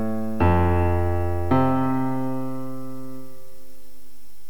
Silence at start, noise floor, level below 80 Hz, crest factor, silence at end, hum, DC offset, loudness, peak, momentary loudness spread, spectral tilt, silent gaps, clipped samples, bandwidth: 0 s; -54 dBFS; -38 dBFS; 16 dB; 1.15 s; none; 5%; -23 LUFS; -8 dBFS; 17 LU; -9 dB/octave; none; under 0.1%; 18.5 kHz